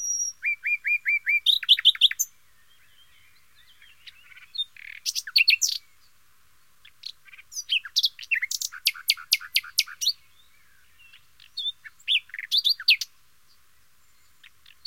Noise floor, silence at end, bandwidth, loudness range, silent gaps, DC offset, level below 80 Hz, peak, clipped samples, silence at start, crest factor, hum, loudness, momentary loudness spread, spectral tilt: -63 dBFS; 1.8 s; 17 kHz; 6 LU; none; 0.2%; -74 dBFS; -4 dBFS; under 0.1%; 0 s; 24 dB; none; -22 LUFS; 18 LU; 6.5 dB/octave